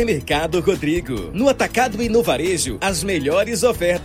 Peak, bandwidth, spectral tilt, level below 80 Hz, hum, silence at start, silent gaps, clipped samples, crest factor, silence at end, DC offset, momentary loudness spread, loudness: -2 dBFS; 16.5 kHz; -4 dB/octave; -36 dBFS; none; 0 s; none; under 0.1%; 16 dB; 0 s; under 0.1%; 4 LU; -19 LUFS